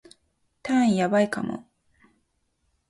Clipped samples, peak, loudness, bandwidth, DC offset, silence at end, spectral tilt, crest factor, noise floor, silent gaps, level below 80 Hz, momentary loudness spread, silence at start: under 0.1%; -10 dBFS; -24 LUFS; 11.5 kHz; under 0.1%; 1.3 s; -6 dB/octave; 16 dB; -72 dBFS; none; -66 dBFS; 17 LU; 0.65 s